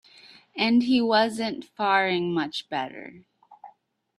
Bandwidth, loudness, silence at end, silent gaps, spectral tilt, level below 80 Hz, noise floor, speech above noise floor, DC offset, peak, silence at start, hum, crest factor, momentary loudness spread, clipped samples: 12 kHz; -24 LUFS; 0.5 s; none; -5 dB/octave; -70 dBFS; -60 dBFS; 36 dB; under 0.1%; -8 dBFS; 0.55 s; none; 18 dB; 16 LU; under 0.1%